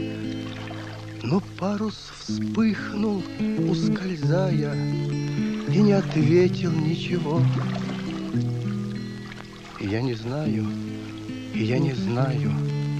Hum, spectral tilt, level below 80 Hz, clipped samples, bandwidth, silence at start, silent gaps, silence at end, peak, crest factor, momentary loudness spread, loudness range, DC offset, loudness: none; -7.5 dB/octave; -52 dBFS; under 0.1%; 9.2 kHz; 0 s; none; 0 s; -8 dBFS; 16 dB; 14 LU; 6 LU; under 0.1%; -25 LUFS